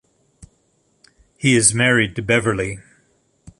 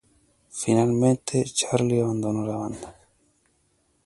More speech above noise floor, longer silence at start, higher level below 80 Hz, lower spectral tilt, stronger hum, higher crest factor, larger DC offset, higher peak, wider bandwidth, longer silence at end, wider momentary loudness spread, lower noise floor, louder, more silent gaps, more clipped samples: about the same, 46 dB vs 44 dB; first, 1.4 s vs 0.55 s; first, -48 dBFS vs -58 dBFS; second, -3.5 dB/octave vs -5.5 dB/octave; neither; about the same, 20 dB vs 20 dB; neither; first, 0 dBFS vs -6 dBFS; about the same, 11.5 kHz vs 11.5 kHz; second, 0.1 s vs 1.15 s; second, 12 LU vs 15 LU; second, -63 dBFS vs -67 dBFS; first, -17 LUFS vs -24 LUFS; neither; neither